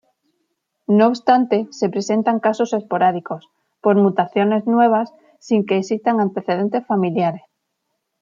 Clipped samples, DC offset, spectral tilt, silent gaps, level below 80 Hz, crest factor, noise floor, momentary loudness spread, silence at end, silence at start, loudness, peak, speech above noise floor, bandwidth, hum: under 0.1%; under 0.1%; -7 dB/octave; none; -70 dBFS; 16 dB; -74 dBFS; 7 LU; 0.85 s; 0.9 s; -18 LUFS; -2 dBFS; 57 dB; 7.4 kHz; none